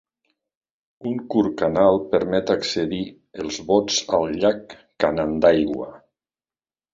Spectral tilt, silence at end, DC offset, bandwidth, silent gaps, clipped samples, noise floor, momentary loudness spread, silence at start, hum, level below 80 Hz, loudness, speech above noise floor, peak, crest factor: -4.5 dB/octave; 0.95 s; under 0.1%; 7.8 kHz; none; under 0.1%; under -90 dBFS; 14 LU; 1 s; none; -52 dBFS; -21 LUFS; over 69 dB; -2 dBFS; 20 dB